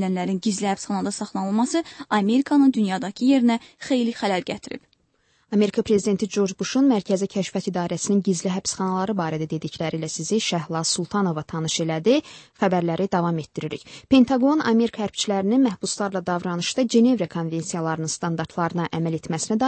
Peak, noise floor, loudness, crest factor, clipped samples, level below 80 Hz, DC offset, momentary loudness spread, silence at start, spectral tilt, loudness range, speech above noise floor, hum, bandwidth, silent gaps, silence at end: -4 dBFS; -65 dBFS; -23 LUFS; 18 dB; under 0.1%; -60 dBFS; under 0.1%; 9 LU; 0 s; -5 dB/octave; 3 LU; 43 dB; none; 8.8 kHz; none; 0 s